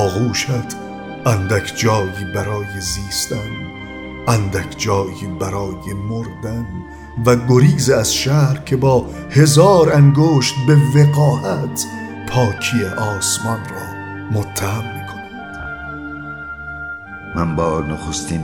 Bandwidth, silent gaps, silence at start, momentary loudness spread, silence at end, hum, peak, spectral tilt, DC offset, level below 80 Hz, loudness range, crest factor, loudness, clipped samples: 18 kHz; none; 0 s; 17 LU; 0 s; none; 0 dBFS; -5.5 dB/octave; 0.2%; -40 dBFS; 12 LU; 16 dB; -16 LUFS; under 0.1%